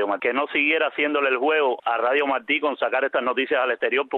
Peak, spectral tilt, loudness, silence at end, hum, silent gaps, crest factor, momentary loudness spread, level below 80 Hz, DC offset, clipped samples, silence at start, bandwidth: -8 dBFS; -6 dB/octave; -22 LUFS; 0 s; none; none; 14 dB; 3 LU; -74 dBFS; under 0.1%; under 0.1%; 0 s; 4.3 kHz